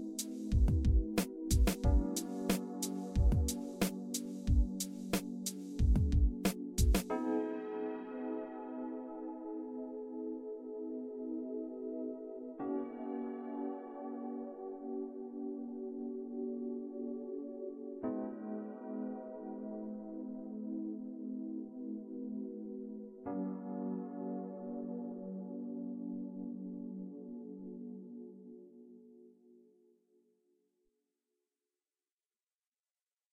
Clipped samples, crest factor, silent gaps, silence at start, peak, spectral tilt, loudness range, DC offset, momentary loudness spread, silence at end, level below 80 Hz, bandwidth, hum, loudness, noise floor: under 0.1%; 20 dB; none; 0 s; -18 dBFS; -6 dB/octave; 10 LU; under 0.1%; 13 LU; 3.75 s; -42 dBFS; 16 kHz; none; -39 LUFS; under -90 dBFS